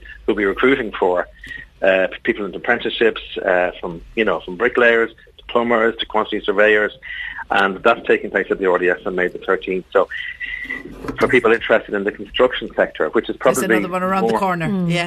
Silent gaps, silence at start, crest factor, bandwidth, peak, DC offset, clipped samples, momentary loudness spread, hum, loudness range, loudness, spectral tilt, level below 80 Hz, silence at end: none; 0 s; 16 dB; 13 kHz; -4 dBFS; under 0.1%; under 0.1%; 10 LU; none; 2 LU; -18 LUFS; -5 dB/octave; -46 dBFS; 0 s